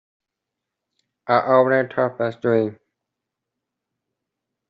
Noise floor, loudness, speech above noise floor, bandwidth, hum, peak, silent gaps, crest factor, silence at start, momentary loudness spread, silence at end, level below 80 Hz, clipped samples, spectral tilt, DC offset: -83 dBFS; -20 LUFS; 65 dB; 5.4 kHz; none; -4 dBFS; none; 20 dB; 1.25 s; 9 LU; 1.95 s; -72 dBFS; under 0.1%; -5 dB/octave; under 0.1%